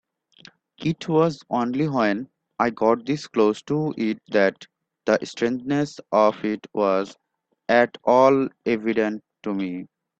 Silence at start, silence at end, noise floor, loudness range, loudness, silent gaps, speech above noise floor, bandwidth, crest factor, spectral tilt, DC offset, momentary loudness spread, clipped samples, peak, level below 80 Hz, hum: 0.8 s; 0.35 s; -52 dBFS; 3 LU; -23 LUFS; none; 30 dB; 8.4 kHz; 20 dB; -6.5 dB/octave; under 0.1%; 10 LU; under 0.1%; -4 dBFS; -64 dBFS; none